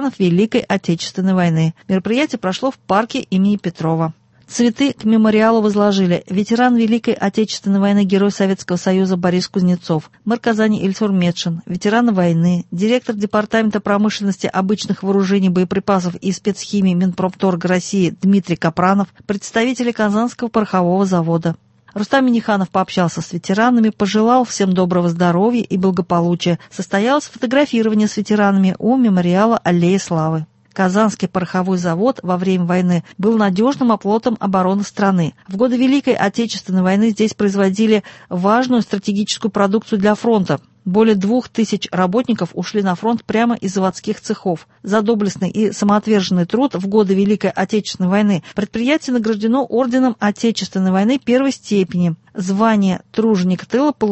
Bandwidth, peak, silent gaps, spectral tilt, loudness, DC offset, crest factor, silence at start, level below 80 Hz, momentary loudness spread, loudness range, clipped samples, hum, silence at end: 8.4 kHz; 0 dBFS; none; -6 dB/octave; -16 LUFS; under 0.1%; 14 dB; 0 s; -54 dBFS; 6 LU; 2 LU; under 0.1%; none; 0 s